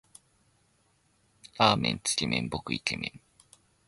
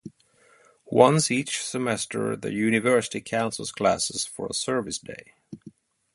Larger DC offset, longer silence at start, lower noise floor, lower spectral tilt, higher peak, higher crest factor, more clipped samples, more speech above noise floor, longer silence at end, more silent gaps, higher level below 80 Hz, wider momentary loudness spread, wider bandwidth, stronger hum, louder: neither; first, 1.55 s vs 0.05 s; first, -69 dBFS vs -60 dBFS; about the same, -3.5 dB/octave vs -4 dB/octave; second, -8 dBFS vs -2 dBFS; about the same, 26 dB vs 24 dB; neither; first, 40 dB vs 35 dB; first, 0.7 s vs 0.45 s; neither; first, -56 dBFS vs -62 dBFS; second, 12 LU vs 17 LU; about the same, 12 kHz vs 11.5 kHz; neither; second, -28 LUFS vs -25 LUFS